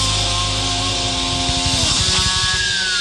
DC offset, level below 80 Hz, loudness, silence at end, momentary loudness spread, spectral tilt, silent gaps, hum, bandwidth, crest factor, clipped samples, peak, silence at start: under 0.1%; -30 dBFS; -16 LUFS; 0 s; 4 LU; -2 dB/octave; none; none; 12.5 kHz; 14 dB; under 0.1%; -4 dBFS; 0 s